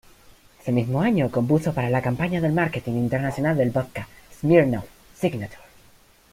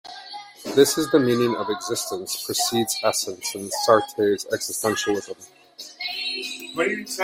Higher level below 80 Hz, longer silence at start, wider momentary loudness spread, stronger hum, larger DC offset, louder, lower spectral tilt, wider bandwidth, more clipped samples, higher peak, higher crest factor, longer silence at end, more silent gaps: first, -52 dBFS vs -64 dBFS; first, 0.65 s vs 0.05 s; second, 14 LU vs 17 LU; neither; neither; about the same, -23 LUFS vs -23 LUFS; first, -8 dB/octave vs -3 dB/octave; about the same, 16 kHz vs 16.5 kHz; neither; about the same, -4 dBFS vs -2 dBFS; about the same, 20 dB vs 20 dB; first, 0.75 s vs 0 s; neither